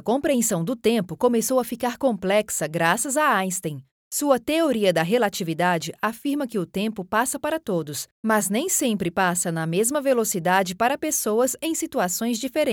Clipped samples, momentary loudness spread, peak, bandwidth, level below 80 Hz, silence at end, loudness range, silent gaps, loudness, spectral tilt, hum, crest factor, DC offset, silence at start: under 0.1%; 7 LU; -6 dBFS; 19.5 kHz; -62 dBFS; 0 s; 2 LU; 3.91-4.11 s, 8.11-8.23 s; -23 LUFS; -4 dB/octave; none; 18 dB; under 0.1%; 0.05 s